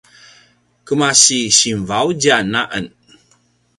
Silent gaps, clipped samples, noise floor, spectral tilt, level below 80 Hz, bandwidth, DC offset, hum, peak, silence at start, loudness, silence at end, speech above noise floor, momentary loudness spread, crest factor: none; under 0.1%; -57 dBFS; -2 dB/octave; -52 dBFS; 16 kHz; under 0.1%; 60 Hz at -45 dBFS; 0 dBFS; 0.85 s; -13 LUFS; 0.9 s; 43 dB; 13 LU; 18 dB